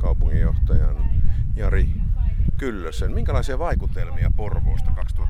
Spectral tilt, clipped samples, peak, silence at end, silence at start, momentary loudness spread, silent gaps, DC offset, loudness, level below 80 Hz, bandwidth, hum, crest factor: -8 dB/octave; under 0.1%; -6 dBFS; 0 s; 0 s; 5 LU; none; under 0.1%; -24 LUFS; -20 dBFS; 8.4 kHz; none; 12 dB